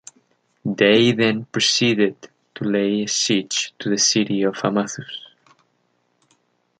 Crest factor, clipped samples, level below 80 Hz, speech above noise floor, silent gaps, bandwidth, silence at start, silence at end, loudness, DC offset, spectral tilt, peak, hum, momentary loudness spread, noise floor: 20 dB; under 0.1%; -64 dBFS; 48 dB; none; 9.4 kHz; 0.65 s; 1.6 s; -19 LUFS; under 0.1%; -3.5 dB/octave; -2 dBFS; 60 Hz at -50 dBFS; 13 LU; -67 dBFS